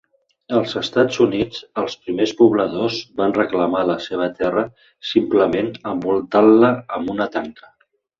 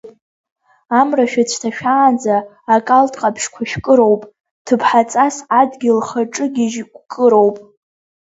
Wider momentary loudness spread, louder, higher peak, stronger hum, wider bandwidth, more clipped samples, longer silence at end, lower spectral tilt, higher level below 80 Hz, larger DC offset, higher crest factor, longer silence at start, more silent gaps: about the same, 10 LU vs 9 LU; second, -19 LUFS vs -15 LUFS; about the same, -2 dBFS vs 0 dBFS; neither; about the same, 7.4 kHz vs 8 kHz; neither; about the same, 0.65 s vs 0.65 s; first, -6 dB/octave vs -4.5 dB/octave; about the same, -56 dBFS vs -56 dBFS; neither; about the same, 16 dB vs 16 dB; first, 0.5 s vs 0.05 s; second, none vs 0.21-0.44 s, 0.52-0.56 s, 4.51-4.65 s